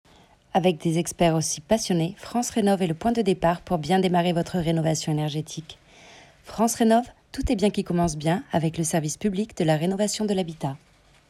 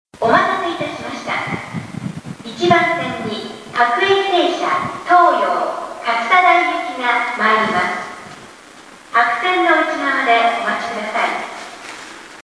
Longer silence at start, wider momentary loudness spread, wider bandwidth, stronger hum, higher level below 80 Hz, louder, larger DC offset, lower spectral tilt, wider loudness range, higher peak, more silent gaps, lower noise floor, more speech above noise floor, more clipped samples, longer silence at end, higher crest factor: first, 0.55 s vs 0.2 s; second, 9 LU vs 17 LU; first, 14.5 kHz vs 11 kHz; neither; first, -46 dBFS vs -58 dBFS; second, -24 LUFS vs -16 LUFS; neither; first, -5.5 dB/octave vs -4 dB/octave; about the same, 2 LU vs 4 LU; second, -8 dBFS vs 0 dBFS; neither; first, -55 dBFS vs -40 dBFS; first, 32 dB vs 25 dB; neither; first, 0.55 s vs 0 s; about the same, 18 dB vs 16 dB